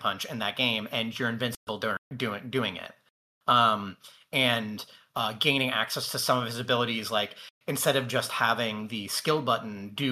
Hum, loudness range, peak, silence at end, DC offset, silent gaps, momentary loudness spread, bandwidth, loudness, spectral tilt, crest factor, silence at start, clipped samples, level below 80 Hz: none; 2 LU; -8 dBFS; 0 s; under 0.1%; 1.57-1.67 s, 1.98-2.11 s, 3.10-3.41 s, 7.50-7.61 s; 10 LU; 16 kHz; -28 LUFS; -3.5 dB/octave; 20 dB; 0 s; under 0.1%; -74 dBFS